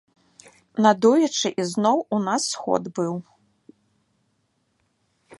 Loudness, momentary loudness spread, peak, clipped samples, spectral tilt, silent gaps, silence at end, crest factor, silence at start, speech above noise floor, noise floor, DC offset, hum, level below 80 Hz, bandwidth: -22 LUFS; 10 LU; -2 dBFS; under 0.1%; -4.5 dB/octave; none; 2.2 s; 22 dB; 0.75 s; 49 dB; -70 dBFS; under 0.1%; none; -72 dBFS; 11.5 kHz